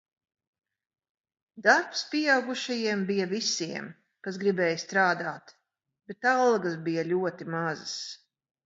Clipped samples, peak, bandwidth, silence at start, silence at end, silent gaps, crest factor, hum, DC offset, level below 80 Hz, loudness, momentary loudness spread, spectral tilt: under 0.1%; -8 dBFS; 8 kHz; 1.55 s; 0.5 s; none; 22 dB; none; under 0.1%; -80 dBFS; -27 LUFS; 15 LU; -4 dB/octave